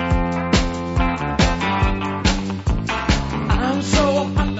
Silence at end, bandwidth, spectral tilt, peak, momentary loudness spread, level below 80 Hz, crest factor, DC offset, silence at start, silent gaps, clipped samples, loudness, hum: 0 s; 8 kHz; -5.5 dB/octave; -2 dBFS; 4 LU; -24 dBFS; 18 dB; under 0.1%; 0 s; none; under 0.1%; -20 LUFS; none